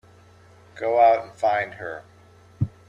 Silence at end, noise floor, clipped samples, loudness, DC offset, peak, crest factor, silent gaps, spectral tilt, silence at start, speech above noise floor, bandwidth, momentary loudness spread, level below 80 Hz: 0.2 s; -51 dBFS; under 0.1%; -22 LUFS; under 0.1%; -6 dBFS; 18 dB; none; -7 dB/octave; 0.75 s; 30 dB; 8.8 kHz; 18 LU; -60 dBFS